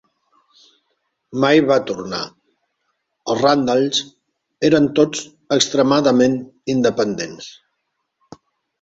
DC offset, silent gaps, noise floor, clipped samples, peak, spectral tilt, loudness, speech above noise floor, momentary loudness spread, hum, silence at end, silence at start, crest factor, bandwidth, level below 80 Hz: under 0.1%; none; -74 dBFS; under 0.1%; -2 dBFS; -4.5 dB/octave; -17 LUFS; 57 dB; 15 LU; none; 1.3 s; 1.3 s; 18 dB; 8 kHz; -58 dBFS